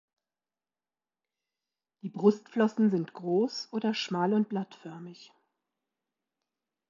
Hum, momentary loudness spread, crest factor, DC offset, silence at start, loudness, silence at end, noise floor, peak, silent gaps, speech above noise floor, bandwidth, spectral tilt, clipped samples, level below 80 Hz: none; 18 LU; 22 dB; under 0.1%; 2.05 s; -29 LUFS; 1.65 s; under -90 dBFS; -10 dBFS; none; over 61 dB; 7.4 kHz; -6.5 dB/octave; under 0.1%; -86 dBFS